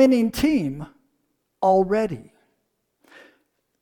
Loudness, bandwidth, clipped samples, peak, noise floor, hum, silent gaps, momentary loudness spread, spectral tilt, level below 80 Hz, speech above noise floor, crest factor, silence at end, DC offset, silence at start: -21 LUFS; 19 kHz; under 0.1%; -6 dBFS; -73 dBFS; none; none; 19 LU; -6.5 dB/octave; -50 dBFS; 53 dB; 18 dB; 1.6 s; under 0.1%; 0 s